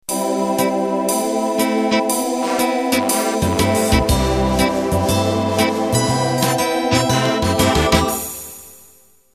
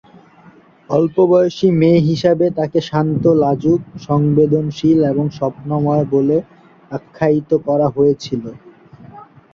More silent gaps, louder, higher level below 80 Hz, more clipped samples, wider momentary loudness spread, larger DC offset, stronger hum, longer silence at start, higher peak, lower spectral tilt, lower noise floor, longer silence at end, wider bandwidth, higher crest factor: neither; about the same, -17 LUFS vs -15 LUFS; first, -32 dBFS vs -50 dBFS; neither; second, 4 LU vs 8 LU; neither; neither; second, 0.1 s vs 0.9 s; about the same, 0 dBFS vs 0 dBFS; second, -4.5 dB/octave vs -8.5 dB/octave; first, -51 dBFS vs -46 dBFS; first, 0.6 s vs 0.3 s; first, 14 kHz vs 7.2 kHz; about the same, 18 dB vs 14 dB